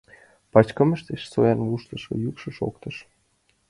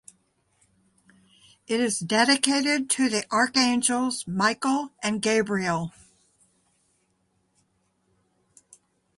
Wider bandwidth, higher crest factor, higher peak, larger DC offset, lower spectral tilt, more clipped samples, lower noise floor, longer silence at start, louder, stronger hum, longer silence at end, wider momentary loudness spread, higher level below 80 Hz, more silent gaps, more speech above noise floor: about the same, 11.5 kHz vs 11.5 kHz; about the same, 24 dB vs 24 dB; about the same, -2 dBFS vs -2 dBFS; neither; first, -8 dB/octave vs -3 dB/octave; neither; second, -67 dBFS vs -71 dBFS; second, 0.55 s vs 1.7 s; about the same, -24 LUFS vs -23 LUFS; neither; second, 0.65 s vs 3.3 s; first, 14 LU vs 7 LU; first, -54 dBFS vs -68 dBFS; neither; about the same, 44 dB vs 47 dB